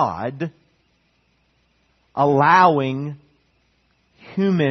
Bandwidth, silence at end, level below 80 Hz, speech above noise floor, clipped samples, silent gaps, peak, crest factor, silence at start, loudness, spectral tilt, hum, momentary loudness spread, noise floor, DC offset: 6.4 kHz; 0 s; -62 dBFS; 46 dB; under 0.1%; none; -2 dBFS; 20 dB; 0 s; -18 LUFS; -7.5 dB/octave; none; 19 LU; -64 dBFS; under 0.1%